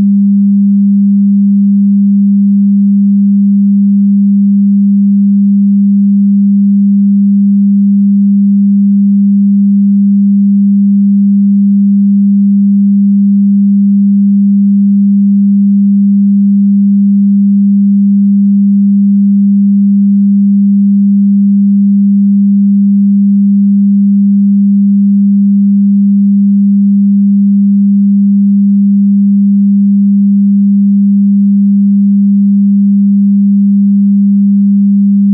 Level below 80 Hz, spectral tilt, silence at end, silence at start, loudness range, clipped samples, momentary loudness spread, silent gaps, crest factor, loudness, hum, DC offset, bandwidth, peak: -64 dBFS; -23 dB/octave; 0 s; 0 s; 0 LU; under 0.1%; 0 LU; none; 4 dB; -7 LUFS; none; under 0.1%; 0.3 kHz; -4 dBFS